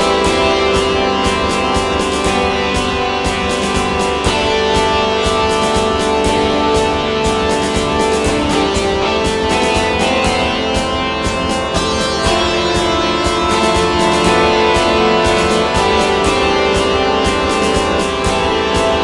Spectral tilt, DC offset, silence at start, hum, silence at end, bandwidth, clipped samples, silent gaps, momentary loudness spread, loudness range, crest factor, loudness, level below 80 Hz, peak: -4 dB/octave; under 0.1%; 0 s; none; 0 s; 11.5 kHz; under 0.1%; none; 4 LU; 2 LU; 14 dB; -14 LUFS; -28 dBFS; 0 dBFS